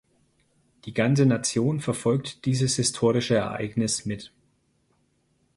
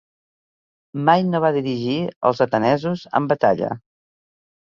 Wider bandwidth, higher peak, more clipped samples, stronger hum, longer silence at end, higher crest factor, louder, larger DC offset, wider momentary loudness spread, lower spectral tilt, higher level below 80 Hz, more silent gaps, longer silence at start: first, 11.5 kHz vs 7.2 kHz; second, -8 dBFS vs -2 dBFS; neither; neither; first, 1.3 s vs 0.9 s; about the same, 18 dB vs 20 dB; second, -24 LUFS vs -20 LUFS; neither; about the same, 9 LU vs 7 LU; second, -5 dB/octave vs -7.5 dB/octave; about the same, -58 dBFS vs -60 dBFS; second, none vs 2.16-2.21 s; about the same, 0.85 s vs 0.95 s